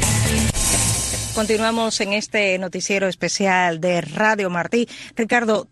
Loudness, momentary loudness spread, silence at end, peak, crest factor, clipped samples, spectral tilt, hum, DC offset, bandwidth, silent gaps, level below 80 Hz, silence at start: -19 LUFS; 5 LU; 0.05 s; -4 dBFS; 16 dB; under 0.1%; -3.5 dB/octave; none; under 0.1%; 12.5 kHz; none; -34 dBFS; 0 s